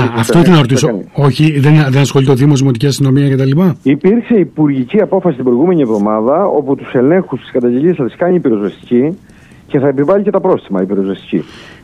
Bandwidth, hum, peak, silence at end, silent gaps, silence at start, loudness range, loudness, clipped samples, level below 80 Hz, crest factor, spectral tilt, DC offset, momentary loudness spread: 13.5 kHz; none; 0 dBFS; 0.15 s; none; 0 s; 4 LU; -11 LUFS; under 0.1%; -46 dBFS; 10 dB; -7 dB/octave; under 0.1%; 7 LU